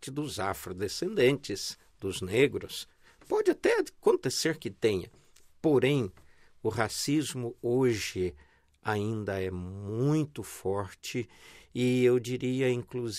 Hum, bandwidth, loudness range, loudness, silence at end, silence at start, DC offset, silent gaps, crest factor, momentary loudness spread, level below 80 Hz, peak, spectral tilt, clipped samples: none; 16 kHz; 4 LU; -30 LUFS; 0 s; 0 s; under 0.1%; none; 20 dB; 11 LU; -62 dBFS; -10 dBFS; -5 dB/octave; under 0.1%